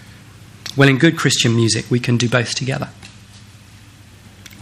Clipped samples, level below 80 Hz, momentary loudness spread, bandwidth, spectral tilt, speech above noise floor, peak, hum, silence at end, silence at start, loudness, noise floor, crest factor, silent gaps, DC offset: under 0.1%; -52 dBFS; 13 LU; 14 kHz; -4.5 dB/octave; 27 dB; 0 dBFS; none; 0.05 s; 0.1 s; -16 LUFS; -43 dBFS; 18 dB; none; under 0.1%